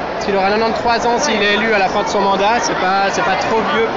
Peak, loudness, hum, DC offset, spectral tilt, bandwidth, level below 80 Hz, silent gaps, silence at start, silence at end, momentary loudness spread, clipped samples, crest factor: -6 dBFS; -15 LUFS; none; 0.4%; -3.5 dB/octave; 7.8 kHz; -42 dBFS; none; 0 s; 0 s; 2 LU; under 0.1%; 8 dB